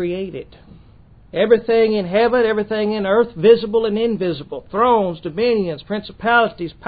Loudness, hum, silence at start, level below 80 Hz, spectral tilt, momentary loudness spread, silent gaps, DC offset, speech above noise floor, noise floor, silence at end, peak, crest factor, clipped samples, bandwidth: -17 LUFS; none; 0 s; -48 dBFS; -11 dB/octave; 12 LU; none; under 0.1%; 29 dB; -46 dBFS; 0 s; 0 dBFS; 18 dB; under 0.1%; 4.9 kHz